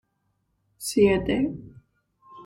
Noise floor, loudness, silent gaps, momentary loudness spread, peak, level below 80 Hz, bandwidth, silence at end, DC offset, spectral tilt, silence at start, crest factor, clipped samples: -73 dBFS; -24 LUFS; none; 14 LU; -8 dBFS; -48 dBFS; 16 kHz; 0 s; under 0.1%; -5.5 dB/octave; 0.8 s; 20 dB; under 0.1%